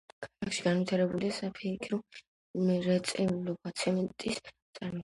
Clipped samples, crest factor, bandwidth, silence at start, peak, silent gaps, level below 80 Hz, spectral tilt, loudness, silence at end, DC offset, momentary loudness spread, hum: under 0.1%; 18 dB; 11.5 kHz; 0.2 s; -14 dBFS; 2.27-2.54 s, 4.62-4.73 s; -66 dBFS; -5.5 dB/octave; -33 LUFS; 0 s; under 0.1%; 13 LU; none